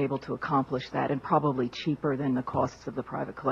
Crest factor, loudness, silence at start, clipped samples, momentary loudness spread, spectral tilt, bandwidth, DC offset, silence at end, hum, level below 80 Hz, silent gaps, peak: 18 dB; -30 LUFS; 0 s; under 0.1%; 8 LU; -7.5 dB/octave; 7.4 kHz; under 0.1%; 0 s; none; -60 dBFS; none; -10 dBFS